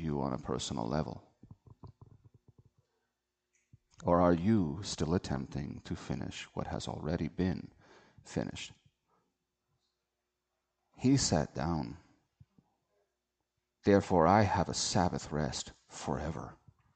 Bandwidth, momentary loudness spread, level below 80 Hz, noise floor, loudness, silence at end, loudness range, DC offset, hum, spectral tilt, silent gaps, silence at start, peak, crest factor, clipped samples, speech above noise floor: 9 kHz; 16 LU; -54 dBFS; -86 dBFS; -33 LUFS; 0.4 s; 11 LU; under 0.1%; none; -5.5 dB/octave; none; 0 s; -12 dBFS; 24 dB; under 0.1%; 54 dB